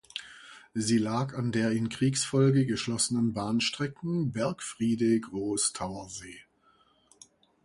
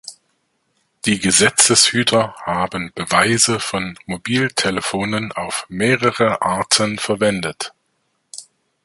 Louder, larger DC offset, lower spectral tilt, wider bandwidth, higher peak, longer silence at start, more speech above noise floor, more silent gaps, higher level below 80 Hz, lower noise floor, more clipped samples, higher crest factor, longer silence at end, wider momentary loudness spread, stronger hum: second, -29 LUFS vs -17 LUFS; neither; first, -5 dB/octave vs -2.5 dB/octave; about the same, 11.5 kHz vs 12 kHz; second, -12 dBFS vs 0 dBFS; about the same, 0.15 s vs 0.05 s; second, 37 dB vs 50 dB; neither; second, -62 dBFS vs -52 dBFS; about the same, -65 dBFS vs -68 dBFS; neither; about the same, 18 dB vs 18 dB; first, 1.25 s vs 0.4 s; about the same, 15 LU vs 15 LU; neither